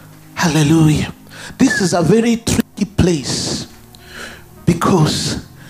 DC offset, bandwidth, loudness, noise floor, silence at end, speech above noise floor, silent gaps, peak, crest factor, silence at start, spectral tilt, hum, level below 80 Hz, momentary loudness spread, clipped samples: under 0.1%; 15.5 kHz; -15 LUFS; -39 dBFS; 0 s; 25 dB; none; 0 dBFS; 16 dB; 0.35 s; -5 dB/octave; none; -38 dBFS; 19 LU; under 0.1%